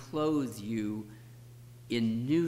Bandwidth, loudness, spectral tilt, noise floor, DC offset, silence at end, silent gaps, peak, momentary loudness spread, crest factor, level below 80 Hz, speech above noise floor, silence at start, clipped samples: 16 kHz; -33 LUFS; -6.5 dB/octave; -51 dBFS; under 0.1%; 0 s; none; -18 dBFS; 22 LU; 14 dB; -66 dBFS; 20 dB; 0 s; under 0.1%